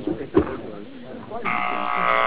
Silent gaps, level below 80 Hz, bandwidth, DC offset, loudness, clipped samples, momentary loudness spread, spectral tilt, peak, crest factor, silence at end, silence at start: none; -46 dBFS; 4 kHz; under 0.1%; -24 LUFS; under 0.1%; 16 LU; -9 dB/octave; -6 dBFS; 18 dB; 0 s; 0 s